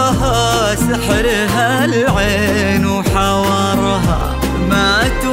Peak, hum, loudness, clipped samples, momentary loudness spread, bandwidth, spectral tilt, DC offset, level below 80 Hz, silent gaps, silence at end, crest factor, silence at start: -2 dBFS; none; -14 LUFS; under 0.1%; 3 LU; 16.5 kHz; -4.5 dB/octave; under 0.1%; -24 dBFS; none; 0 s; 12 dB; 0 s